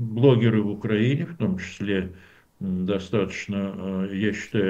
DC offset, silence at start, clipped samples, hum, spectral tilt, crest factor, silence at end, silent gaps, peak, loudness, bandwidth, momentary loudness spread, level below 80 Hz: under 0.1%; 0 s; under 0.1%; none; -7.5 dB/octave; 20 dB; 0 s; none; -4 dBFS; -25 LUFS; 8 kHz; 10 LU; -56 dBFS